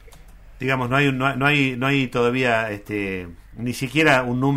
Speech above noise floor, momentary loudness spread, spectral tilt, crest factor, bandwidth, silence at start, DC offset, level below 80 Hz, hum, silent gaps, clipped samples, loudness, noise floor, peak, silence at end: 23 dB; 12 LU; -6 dB/octave; 16 dB; 16 kHz; 0.05 s; under 0.1%; -46 dBFS; none; none; under 0.1%; -20 LUFS; -44 dBFS; -4 dBFS; 0 s